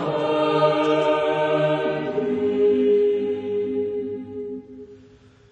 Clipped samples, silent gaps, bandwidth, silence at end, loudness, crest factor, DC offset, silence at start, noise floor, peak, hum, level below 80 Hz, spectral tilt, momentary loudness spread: under 0.1%; none; 8.4 kHz; 0.55 s; -21 LUFS; 16 dB; under 0.1%; 0 s; -50 dBFS; -6 dBFS; none; -60 dBFS; -7 dB/octave; 13 LU